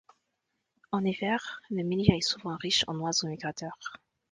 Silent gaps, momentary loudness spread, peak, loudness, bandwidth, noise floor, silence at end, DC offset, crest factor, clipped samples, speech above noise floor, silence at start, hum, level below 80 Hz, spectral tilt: none; 13 LU; -6 dBFS; -30 LUFS; 10 kHz; -81 dBFS; 0.35 s; under 0.1%; 26 dB; under 0.1%; 51 dB; 0.9 s; none; -54 dBFS; -4 dB/octave